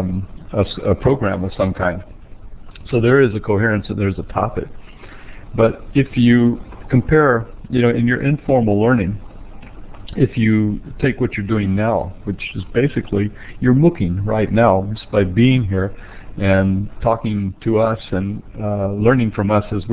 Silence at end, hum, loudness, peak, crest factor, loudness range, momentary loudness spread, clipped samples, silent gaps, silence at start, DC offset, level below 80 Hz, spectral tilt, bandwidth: 0 s; none; -17 LUFS; -2 dBFS; 16 dB; 4 LU; 11 LU; under 0.1%; none; 0 s; under 0.1%; -34 dBFS; -12 dB/octave; 4 kHz